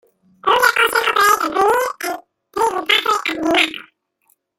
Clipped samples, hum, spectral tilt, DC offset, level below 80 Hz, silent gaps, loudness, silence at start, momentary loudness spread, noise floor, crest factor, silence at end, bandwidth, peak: under 0.1%; none; -1 dB/octave; under 0.1%; -56 dBFS; none; -16 LUFS; 0.45 s; 12 LU; -63 dBFS; 18 dB; 0.75 s; 17 kHz; 0 dBFS